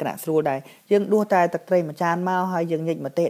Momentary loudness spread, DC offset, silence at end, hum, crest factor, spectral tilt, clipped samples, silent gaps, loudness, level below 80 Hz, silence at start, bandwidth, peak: 6 LU; under 0.1%; 0 s; none; 16 dB; -7 dB/octave; under 0.1%; none; -23 LUFS; -76 dBFS; 0 s; 16 kHz; -6 dBFS